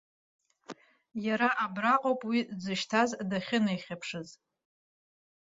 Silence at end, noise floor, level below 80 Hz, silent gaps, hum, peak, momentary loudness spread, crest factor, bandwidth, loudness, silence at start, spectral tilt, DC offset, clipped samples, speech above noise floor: 1.2 s; -50 dBFS; -74 dBFS; none; none; -12 dBFS; 21 LU; 20 dB; 7.8 kHz; -30 LUFS; 0.7 s; -5 dB/octave; under 0.1%; under 0.1%; 20 dB